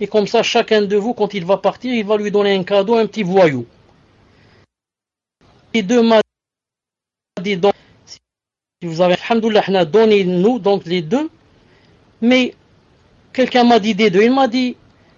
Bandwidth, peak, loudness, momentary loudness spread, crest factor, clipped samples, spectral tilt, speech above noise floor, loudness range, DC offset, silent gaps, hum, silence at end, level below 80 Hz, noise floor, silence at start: 7.6 kHz; -2 dBFS; -15 LUFS; 10 LU; 14 dB; under 0.1%; -5.5 dB/octave; 73 dB; 5 LU; under 0.1%; none; none; 0.45 s; -60 dBFS; -87 dBFS; 0 s